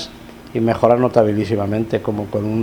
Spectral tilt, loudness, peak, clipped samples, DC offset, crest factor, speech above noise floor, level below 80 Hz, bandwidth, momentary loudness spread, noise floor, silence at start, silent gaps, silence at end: -8 dB/octave; -18 LUFS; 0 dBFS; under 0.1%; under 0.1%; 18 dB; 20 dB; -48 dBFS; 19.5 kHz; 8 LU; -37 dBFS; 0 s; none; 0 s